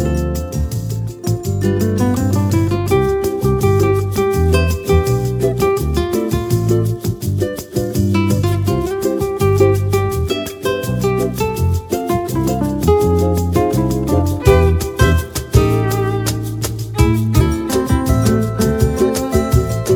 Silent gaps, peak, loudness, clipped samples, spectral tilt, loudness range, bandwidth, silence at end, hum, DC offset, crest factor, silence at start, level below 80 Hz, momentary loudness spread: none; 0 dBFS; -16 LUFS; under 0.1%; -6.5 dB/octave; 2 LU; 19.5 kHz; 0 s; none; under 0.1%; 16 dB; 0 s; -26 dBFS; 7 LU